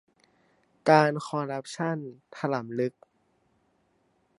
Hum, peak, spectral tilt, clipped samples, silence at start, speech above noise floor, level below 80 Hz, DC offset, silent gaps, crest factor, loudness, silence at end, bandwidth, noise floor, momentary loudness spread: none; -4 dBFS; -6 dB/octave; under 0.1%; 0.85 s; 43 dB; -78 dBFS; under 0.1%; none; 26 dB; -27 LUFS; 1.5 s; 11.5 kHz; -70 dBFS; 13 LU